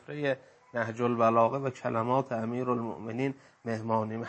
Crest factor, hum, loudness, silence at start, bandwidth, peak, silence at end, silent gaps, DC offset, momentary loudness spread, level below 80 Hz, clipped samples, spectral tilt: 18 dB; none; -30 LUFS; 0.1 s; 8.6 kHz; -12 dBFS; 0 s; none; under 0.1%; 11 LU; -74 dBFS; under 0.1%; -7.5 dB/octave